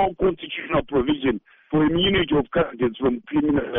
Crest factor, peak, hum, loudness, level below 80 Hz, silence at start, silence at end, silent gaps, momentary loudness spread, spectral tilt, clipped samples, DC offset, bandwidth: 12 dB; -8 dBFS; none; -22 LUFS; -42 dBFS; 0 s; 0 s; none; 6 LU; -4 dB/octave; under 0.1%; under 0.1%; 3.8 kHz